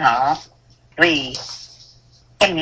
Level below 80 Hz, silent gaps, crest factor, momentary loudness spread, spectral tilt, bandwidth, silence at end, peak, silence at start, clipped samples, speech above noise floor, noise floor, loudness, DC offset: -52 dBFS; none; 20 dB; 20 LU; -3.5 dB/octave; 8 kHz; 0 s; 0 dBFS; 0 s; under 0.1%; 32 dB; -51 dBFS; -18 LUFS; under 0.1%